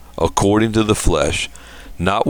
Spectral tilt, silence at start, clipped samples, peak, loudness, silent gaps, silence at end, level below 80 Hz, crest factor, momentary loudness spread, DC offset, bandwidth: -5 dB/octave; 0 s; under 0.1%; 0 dBFS; -17 LUFS; none; 0 s; -28 dBFS; 18 dB; 7 LU; under 0.1%; 19.5 kHz